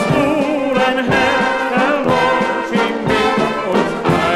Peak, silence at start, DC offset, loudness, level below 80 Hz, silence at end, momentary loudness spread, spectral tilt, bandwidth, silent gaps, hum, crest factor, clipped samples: 0 dBFS; 0 s; under 0.1%; -15 LUFS; -42 dBFS; 0 s; 3 LU; -5.5 dB/octave; 14.5 kHz; none; none; 14 dB; under 0.1%